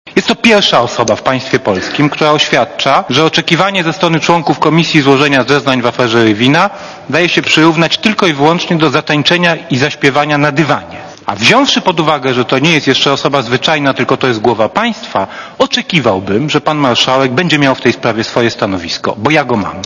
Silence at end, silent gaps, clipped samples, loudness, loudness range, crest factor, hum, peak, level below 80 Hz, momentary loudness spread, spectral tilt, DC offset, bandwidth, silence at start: 0 s; none; 0.8%; -10 LUFS; 2 LU; 10 dB; none; 0 dBFS; -48 dBFS; 6 LU; -4.5 dB/octave; under 0.1%; 11 kHz; 0.05 s